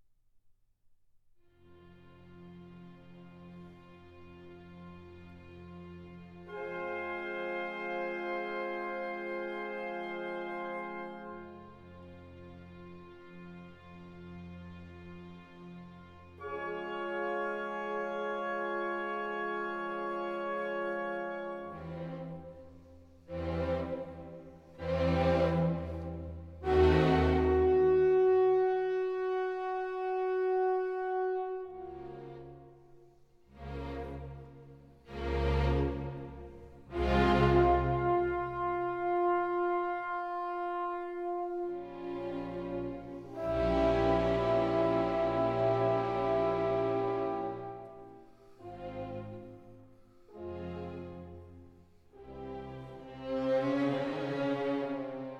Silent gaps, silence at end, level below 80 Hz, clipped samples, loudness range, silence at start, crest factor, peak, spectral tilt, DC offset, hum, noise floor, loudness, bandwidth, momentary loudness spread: none; 0 s; -46 dBFS; under 0.1%; 20 LU; 1.7 s; 20 dB; -14 dBFS; -8 dB/octave; under 0.1%; none; -66 dBFS; -33 LUFS; 7.4 kHz; 24 LU